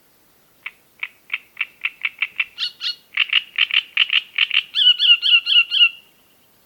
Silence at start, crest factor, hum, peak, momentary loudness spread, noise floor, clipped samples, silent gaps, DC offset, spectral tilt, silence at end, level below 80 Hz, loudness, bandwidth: 0.65 s; 18 dB; none; -2 dBFS; 20 LU; -56 dBFS; under 0.1%; none; under 0.1%; 3 dB/octave; 0.7 s; -76 dBFS; -16 LUFS; 19 kHz